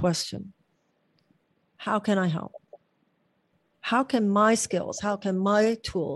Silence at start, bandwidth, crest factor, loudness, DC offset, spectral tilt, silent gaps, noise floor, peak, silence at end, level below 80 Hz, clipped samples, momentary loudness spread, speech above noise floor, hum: 0 s; 12.5 kHz; 18 dB; -26 LUFS; under 0.1%; -5 dB/octave; none; -71 dBFS; -10 dBFS; 0 s; -60 dBFS; under 0.1%; 15 LU; 46 dB; none